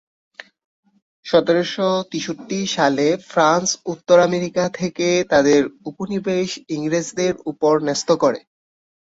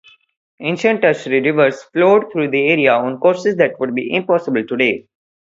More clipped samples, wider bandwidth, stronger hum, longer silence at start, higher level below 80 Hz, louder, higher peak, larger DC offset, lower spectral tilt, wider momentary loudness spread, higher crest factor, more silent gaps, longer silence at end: neither; about the same, 8 kHz vs 7.8 kHz; neither; first, 1.25 s vs 0.6 s; about the same, -60 dBFS vs -62 dBFS; second, -19 LUFS vs -16 LUFS; about the same, -2 dBFS vs 0 dBFS; neither; second, -4.5 dB/octave vs -6 dB/octave; first, 11 LU vs 7 LU; about the same, 18 dB vs 16 dB; neither; first, 0.7 s vs 0.4 s